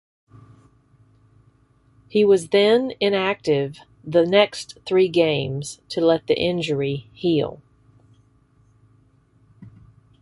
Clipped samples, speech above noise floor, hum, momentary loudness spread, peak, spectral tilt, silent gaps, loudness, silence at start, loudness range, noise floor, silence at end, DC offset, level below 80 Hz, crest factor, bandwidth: under 0.1%; 38 dB; none; 12 LU; -2 dBFS; -5.5 dB/octave; none; -20 LUFS; 2.15 s; 8 LU; -58 dBFS; 0.55 s; under 0.1%; -58 dBFS; 20 dB; 11.5 kHz